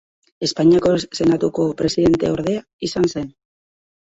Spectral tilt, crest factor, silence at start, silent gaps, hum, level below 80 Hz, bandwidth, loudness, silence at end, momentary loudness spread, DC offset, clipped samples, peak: -6 dB/octave; 16 dB; 0.4 s; 2.73-2.79 s; none; -48 dBFS; 8 kHz; -18 LUFS; 0.75 s; 10 LU; under 0.1%; under 0.1%; -4 dBFS